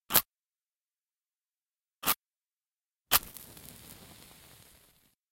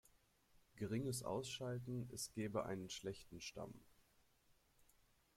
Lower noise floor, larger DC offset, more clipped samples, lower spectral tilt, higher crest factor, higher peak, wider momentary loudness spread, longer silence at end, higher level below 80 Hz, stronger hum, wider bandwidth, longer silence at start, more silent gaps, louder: first, under -90 dBFS vs -76 dBFS; neither; neither; second, -0.5 dB/octave vs -5 dB/octave; first, 36 dB vs 20 dB; first, -2 dBFS vs -28 dBFS; first, 25 LU vs 9 LU; first, 1.9 s vs 1.45 s; first, -62 dBFS vs -74 dBFS; neither; about the same, 17 kHz vs 16.5 kHz; second, 0.1 s vs 0.75 s; first, 1.62-1.66 s, 3.01-3.05 s vs none; first, -29 LUFS vs -47 LUFS